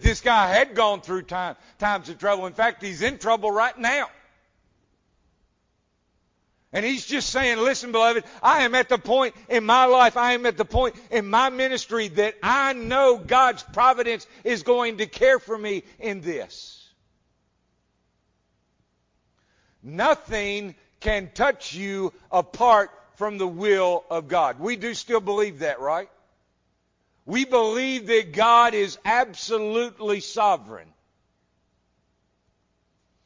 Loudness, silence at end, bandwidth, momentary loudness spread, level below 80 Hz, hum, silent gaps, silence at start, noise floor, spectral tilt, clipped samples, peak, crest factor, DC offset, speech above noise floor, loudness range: -22 LUFS; 2.45 s; 7.6 kHz; 11 LU; -42 dBFS; none; none; 0 s; -70 dBFS; -3.5 dB/octave; under 0.1%; -6 dBFS; 18 dB; under 0.1%; 48 dB; 10 LU